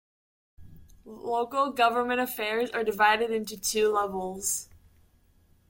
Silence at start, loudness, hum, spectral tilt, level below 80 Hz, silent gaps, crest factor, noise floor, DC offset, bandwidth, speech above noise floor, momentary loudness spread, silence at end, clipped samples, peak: 0.6 s; -27 LUFS; none; -2 dB/octave; -60 dBFS; none; 20 dB; -62 dBFS; under 0.1%; 17 kHz; 35 dB; 8 LU; 1.05 s; under 0.1%; -10 dBFS